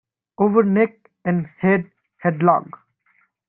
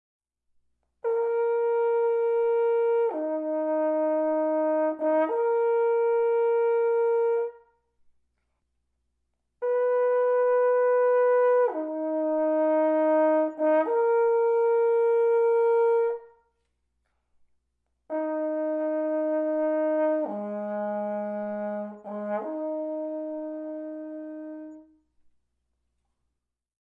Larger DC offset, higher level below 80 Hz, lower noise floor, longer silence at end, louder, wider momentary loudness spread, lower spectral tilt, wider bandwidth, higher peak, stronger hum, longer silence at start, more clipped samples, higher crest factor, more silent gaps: neither; first, -62 dBFS vs -78 dBFS; second, -63 dBFS vs -83 dBFS; second, 0.85 s vs 2.1 s; first, -20 LUFS vs -25 LUFS; second, 8 LU vs 12 LU; first, -12.5 dB/octave vs -9 dB/octave; first, 3.7 kHz vs 3.3 kHz; first, -2 dBFS vs -14 dBFS; second, none vs 60 Hz at -80 dBFS; second, 0.4 s vs 1.05 s; neither; first, 18 dB vs 12 dB; neither